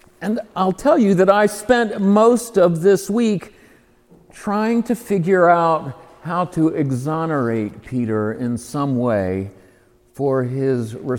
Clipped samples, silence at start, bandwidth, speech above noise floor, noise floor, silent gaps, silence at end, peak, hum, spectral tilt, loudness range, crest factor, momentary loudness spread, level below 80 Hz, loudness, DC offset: under 0.1%; 0.2 s; 18 kHz; 35 dB; -53 dBFS; none; 0 s; 0 dBFS; none; -6.5 dB/octave; 6 LU; 18 dB; 11 LU; -54 dBFS; -18 LUFS; under 0.1%